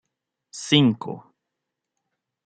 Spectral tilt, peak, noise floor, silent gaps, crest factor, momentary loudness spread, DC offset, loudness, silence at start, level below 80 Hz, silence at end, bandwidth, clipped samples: -5 dB/octave; -4 dBFS; -83 dBFS; none; 24 dB; 21 LU; under 0.1%; -20 LUFS; 0.55 s; -68 dBFS; 1.25 s; 9.2 kHz; under 0.1%